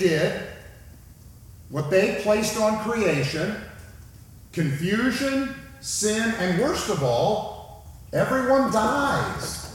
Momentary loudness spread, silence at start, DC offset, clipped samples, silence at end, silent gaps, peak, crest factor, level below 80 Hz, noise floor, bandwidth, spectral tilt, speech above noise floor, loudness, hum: 15 LU; 0 s; under 0.1%; under 0.1%; 0 s; none; -8 dBFS; 16 dB; -48 dBFS; -46 dBFS; 18 kHz; -4.5 dB/octave; 24 dB; -24 LUFS; none